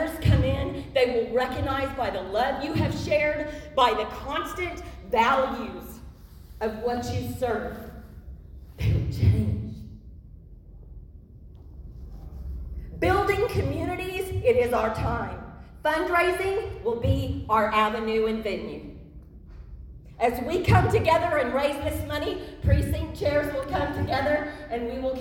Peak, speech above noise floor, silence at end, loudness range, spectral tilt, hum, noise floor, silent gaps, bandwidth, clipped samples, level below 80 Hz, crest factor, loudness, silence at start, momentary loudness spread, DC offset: -8 dBFS; 21 dB; 0 s; 6 LU; -6.5 dB/octave; none; -46 dBFS; none; 17 kHz; under 0.1%; -38 dBFS; 20 dB; -26 LUFS; 0 s; 20 LU; under 0.1%